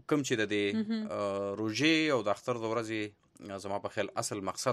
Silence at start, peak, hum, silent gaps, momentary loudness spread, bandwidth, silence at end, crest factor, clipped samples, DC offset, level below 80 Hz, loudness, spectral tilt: 0.1 s; -14 dBFS; none; none; 11 LU; 13.5 kHz; 0 s; 18 dB; under 0.1%; under 0.1%; -74 dBFS; -32 LUFS; -4 dB/octave